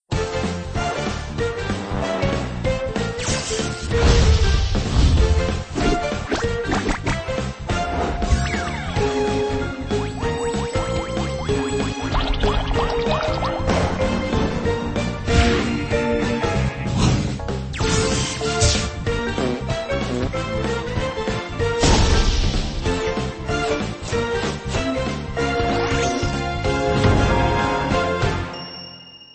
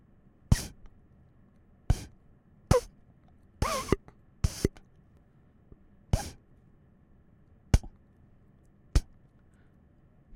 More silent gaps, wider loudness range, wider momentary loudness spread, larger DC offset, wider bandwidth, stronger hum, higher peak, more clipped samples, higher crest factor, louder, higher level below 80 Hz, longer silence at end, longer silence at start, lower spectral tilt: neither; about the same, 3 LU vs 4 LU; second, 7 LU vs 15 LU; neither; second, 8.8 kHz vs 16.5 kHz; neither; about the same, -4 dBFS vs -6 dBFS; neither; second, 16 dB vs 28 dB; first, -22 LUFS vs -32 LUFS; first, -26 dBFS vs -38 dBFS; second, 0.1 s vs 1.3 s; second, 0.1 s vs 0.5 s; about the same, -5 dB/octave vs -5.5 dB/octave